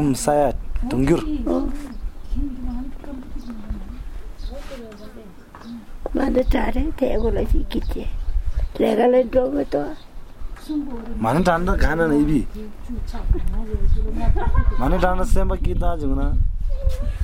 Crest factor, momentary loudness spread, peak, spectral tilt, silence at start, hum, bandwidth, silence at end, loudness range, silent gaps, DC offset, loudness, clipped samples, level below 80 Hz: 18 dB; 18 LU; -2 dBFS; -7 dB/octave; 0 s; none; 15 kHz; 0 s; 12 LU; none; under 0.1%; -22 LUFS; under 0.1%; -24 dBFS